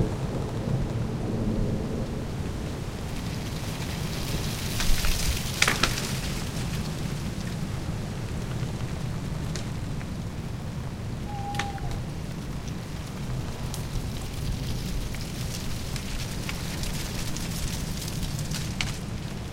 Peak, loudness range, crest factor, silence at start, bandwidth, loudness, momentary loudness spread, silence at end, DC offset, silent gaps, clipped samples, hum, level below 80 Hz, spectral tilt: 0 dBFS; 6 LU; 28 dB; 0 s; 16.5 kHz; -31 LUFS; 7 LU; 0 s; under 0.1%; none; under 0.1%; none; -36 dBFS; -4.5 dB/octave